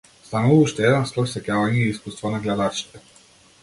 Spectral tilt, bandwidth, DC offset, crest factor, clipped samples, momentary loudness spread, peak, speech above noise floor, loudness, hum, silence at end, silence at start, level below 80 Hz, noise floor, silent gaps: -6 dB/octave; 11.5 kHz; under 0.1%; 18 dB; under 0.1%; 12 LU; -4 dBFS; 32 dB; -21 LUFS; none; 0.65 s; 0.3 s; -54 dBFS; -52 dBFS; none